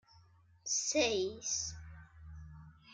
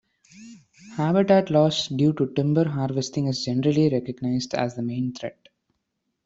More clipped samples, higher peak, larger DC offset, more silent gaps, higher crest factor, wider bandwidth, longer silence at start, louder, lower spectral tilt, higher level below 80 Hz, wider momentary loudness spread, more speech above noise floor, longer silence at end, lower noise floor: neither; second, -20 dBFS vs -6 dBFS; neither; neither; about the same, 20 dB vs 18 dB; first, 11 kHz vs 7.8 kHz; second, 0.15 s vs 0.35 s; second, -34 LUFS vs -23 LUFS; second, -2 dB/octave vs -6.5 dB/octave; about the same, -60 dBFS vs -62 dBFS; first, 23 LU vs 10 LU; second, 30 dB vs 55 dB; second, 0 s vs 0.95 s; second, -64 dBFS vs -77 dBFS